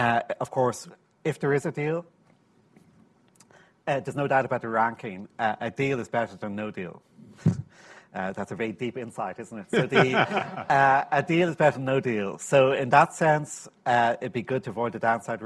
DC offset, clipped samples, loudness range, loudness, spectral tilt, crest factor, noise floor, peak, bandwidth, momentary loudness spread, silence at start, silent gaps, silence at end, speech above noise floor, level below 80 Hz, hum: under 0.1%; under 0.1%; 9 LU; -26 LUFS; -5.5 dB/octave; 22 dB; -61 dBFS; -4 dBFS; 12.5 kHz; 13 LU; 0 s; none; 0 s; 36 dB; -66 dBFS; none